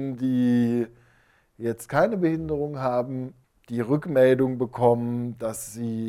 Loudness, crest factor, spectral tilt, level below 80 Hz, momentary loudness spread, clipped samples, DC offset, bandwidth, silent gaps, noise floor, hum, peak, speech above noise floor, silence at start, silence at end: -25 LUFS; 18 dB; -7 dB/octave; -56 dBFS; 12 LU; under 0.1%; under 0.1%; 15.5 kHz; none; -61 dBFS; none; -6 dBFS; 38 dB; 0 s; 0 s